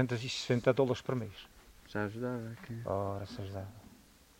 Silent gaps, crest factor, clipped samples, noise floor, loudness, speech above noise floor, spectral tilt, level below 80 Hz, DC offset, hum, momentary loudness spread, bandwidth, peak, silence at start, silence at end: none; 24 dB; under 0.1%; -60 dBFS; -36 LUFS; 26 dB; -6 dB/octave; -64 dBFS; under 0.1%; none; 18 LU; 16 kHz; -12 dBFS; 0 s; 0.45 s